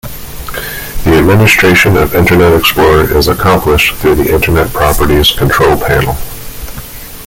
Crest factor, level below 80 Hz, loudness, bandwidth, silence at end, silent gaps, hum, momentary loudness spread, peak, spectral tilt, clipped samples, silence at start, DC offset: 8 dB; -22 dBFS; -8 LUFS; 17 kHz; 0 s; none; none; 18 LU; 0 dBFS; -5 dB/octave; under 0.1%; 0.05 s; under 0.1%